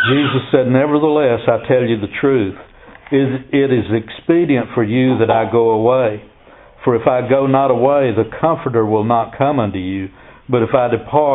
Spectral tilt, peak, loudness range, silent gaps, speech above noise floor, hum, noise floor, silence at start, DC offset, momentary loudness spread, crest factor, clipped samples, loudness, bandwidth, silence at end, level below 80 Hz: -12 dB/octave; 0 dBFS; 2 LU; none; 29 dB; none; -43 dBFS; 0 s; under 0.1%; 7 LU; 14 dB; under 0.1%; -15 LUFS; 4.1 kHz; 0 s; -48 dBFS